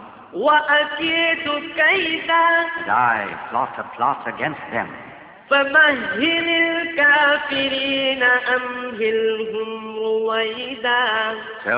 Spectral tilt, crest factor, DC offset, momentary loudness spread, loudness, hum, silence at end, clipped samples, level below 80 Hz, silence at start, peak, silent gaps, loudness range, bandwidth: -6.5 dB/octave; 16 dB; under 0.1%; 11 LU; -18 LUFS; none; 0 s; under 0.1%; -60 dBFS; 0 s; -4 dBFS; none; 4 LU; 4 kHz